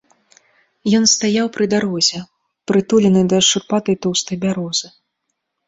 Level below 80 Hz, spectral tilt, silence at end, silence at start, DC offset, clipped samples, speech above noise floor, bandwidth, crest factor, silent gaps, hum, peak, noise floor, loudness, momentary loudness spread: -56 dBFS; -4 dB/octave; 0.8 s; 0.85 s; under 0.1%; under 0.1%; 58 dB; 8 kHz; 16 dB; none; none; -2 dBFS; -74 dBFS; -16 LUFS; 9 LU